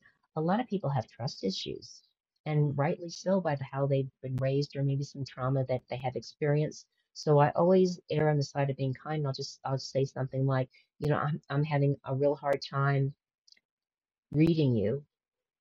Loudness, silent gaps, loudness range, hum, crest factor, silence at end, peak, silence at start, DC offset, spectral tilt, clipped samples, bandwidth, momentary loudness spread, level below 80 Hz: -31 LUFS; 2.40-2.44 s, 13.38-13.42 s, 13.65-13.77 s, 14.18-14.23 s; 4 LU; none; 18 dB; 0.6 s; -12 dBFS; 0.35 s; under 0.1%; -7.5 dB/octave; under 0.1%; 7.4 kHz; 11 LU; -66 dBFS